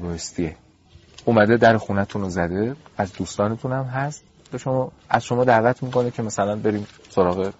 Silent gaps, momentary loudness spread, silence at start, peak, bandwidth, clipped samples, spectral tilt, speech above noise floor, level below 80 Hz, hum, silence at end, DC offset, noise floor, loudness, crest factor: none; 12 LU; 0 s; -2 dBFS; 8 kHz; under 0.1%; -5.5 dB/octave; 30 dB; -50 dBFS; none; 0.1 s; under 0.1%; -51 dBFS; -22 LUFS; 20 dB